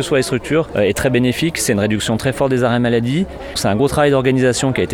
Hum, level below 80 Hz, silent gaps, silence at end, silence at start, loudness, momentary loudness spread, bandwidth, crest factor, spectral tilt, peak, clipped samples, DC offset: none; -38 dBFS; none; 0 s; 0 s; -16 LUFS; 5 LU; 18.5 kHz; 14 dB; -5 dB/octave; -2 dBFS; under 0.1%; under 0.1%